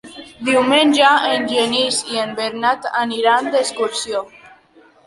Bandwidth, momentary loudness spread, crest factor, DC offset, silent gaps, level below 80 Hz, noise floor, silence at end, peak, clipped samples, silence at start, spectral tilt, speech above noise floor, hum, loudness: 11.5 kHz; 11 LU; 16 dB; under 0.1%; none; -62 dBFS; -50 dBFS; 0.6 s; 0 dBFS; under 0.1%; 0.05 s; -2 dB/octave; 33 dB; none; -16 LUFS